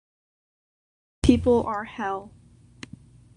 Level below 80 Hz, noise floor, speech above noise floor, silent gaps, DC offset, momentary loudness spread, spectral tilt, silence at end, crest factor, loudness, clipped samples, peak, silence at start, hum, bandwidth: -40 dBFS; -48 dBFS; 24 dB; none; under 0.1%; 24 LU; -6.5 dB/octave; 1.1 s; 24 dB; -24 LUFS; under 0.1%; -4 dBFS; 1.25 s; none; 11 kHz